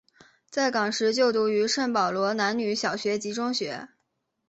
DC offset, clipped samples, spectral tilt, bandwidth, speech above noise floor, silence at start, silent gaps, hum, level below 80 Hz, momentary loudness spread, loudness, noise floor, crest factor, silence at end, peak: under 0.1%; under 0.1%; -3.5 dB/octave; 8.2 kHz; 52 dB; 0.5 s; none; none; -72 dBFS; 6 LU; -26 LUFS; -77 dBFS; 16 dB; 0.65 s; -10 dBFS